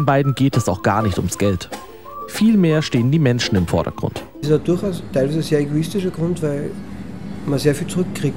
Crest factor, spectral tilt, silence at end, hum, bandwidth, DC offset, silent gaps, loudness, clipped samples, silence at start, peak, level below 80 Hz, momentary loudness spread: 16 dB; -6.5 dB/octave; 0 s; none; 16.5 kHz; 0.6%; none; -19 LUFS; under 0.1%; 0 s; -2 dBFS; -42 dBFS; 13 LU